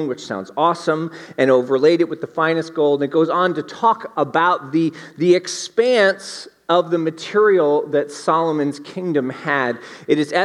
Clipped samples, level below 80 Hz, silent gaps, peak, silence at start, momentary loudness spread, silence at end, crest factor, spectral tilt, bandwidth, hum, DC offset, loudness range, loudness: under 0.1%; -74 dBFS; none; -2 dBFS; 0 s; 9 LU; 0 s; 16 dB; -5 dB/octave; 11.5 kHz; none; under 0.1%; 1 LU; -18 LUFS